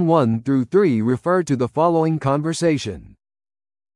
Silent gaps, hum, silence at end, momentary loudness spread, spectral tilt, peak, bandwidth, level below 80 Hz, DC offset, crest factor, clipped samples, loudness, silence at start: none; none; 0.9 s; 5 LU; -7 dB/octave; -4 dBFS; 11.5 kHz; -54 dBFS; under 0.1%; 16 dB; under 0.1%; -19 LUFS; 0 s